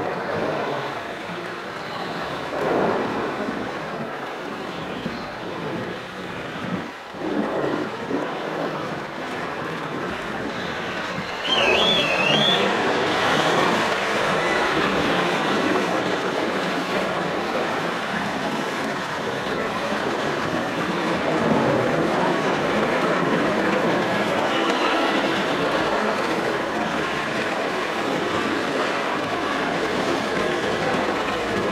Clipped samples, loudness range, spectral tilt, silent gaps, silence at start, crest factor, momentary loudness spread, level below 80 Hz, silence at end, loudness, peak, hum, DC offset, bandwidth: under 0.1%; 8 LU; -4.5 dB/octave; none; 0 s; 20 dB; 10 LU; -54 dBFS; 0 s; -23 LUFS; -4 dBFS; none; under 0.1%; 16 kHz